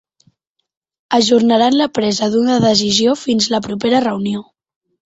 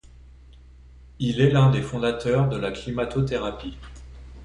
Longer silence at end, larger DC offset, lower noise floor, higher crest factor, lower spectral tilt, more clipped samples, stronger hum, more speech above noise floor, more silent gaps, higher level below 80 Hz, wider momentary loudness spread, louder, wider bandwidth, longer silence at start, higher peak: first, 0.65 s vs 0 s; neither; first, -59 dBFS vs -48 dBFS; about the same, 14 dB vs 18 dB; second, -4 dB/octave vs -7.5 dB/octave; neither; neither; first, 45 dB vs 25 dB; neither; second, -54 dBFS vs -44 dBFS; second, 7 LU vs 24 LU; first, -14 LUFS vs -23 LUFS; second, 8 kHz vs 10 kHz; first, 1.1 s vs 0.25 s; first, -2 dBFS vs -6 dBFS